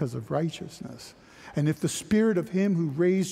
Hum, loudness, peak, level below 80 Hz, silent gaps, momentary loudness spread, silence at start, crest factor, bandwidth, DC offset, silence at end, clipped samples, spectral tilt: none; -27 LUFS; -12 dBFS; -60 dBFS; none; 17 LU; 0 s; 14 dB; 15.5 kHz; under 0.1%; 0 s; under 0.1%; -6.5 dB/octave